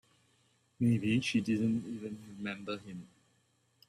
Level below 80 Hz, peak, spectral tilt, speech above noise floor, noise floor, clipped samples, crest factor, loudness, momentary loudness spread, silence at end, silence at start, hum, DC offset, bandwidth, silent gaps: -70 dBFS; -20 dBFS; -6 dB/octave; 40 dB; -73 dBFS; under 0.1%; 16 dB; -34 LUFS; 13 LU; 0.8 s; 0.8 s; none; under 0.1%; 11.5 kHz; none